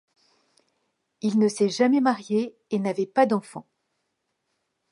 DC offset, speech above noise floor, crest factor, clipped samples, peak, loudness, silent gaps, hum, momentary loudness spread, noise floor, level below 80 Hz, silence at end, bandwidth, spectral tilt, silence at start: under 0.1%; 54 dB; 20 dB; under 0.1%; -6 dBFS; -24 LUFS; none; none; 9 LU; -77 dBFS; -78 dBFS; 1.3 s; 11.5 kHz; -5.5 dB/octave; 1.25 s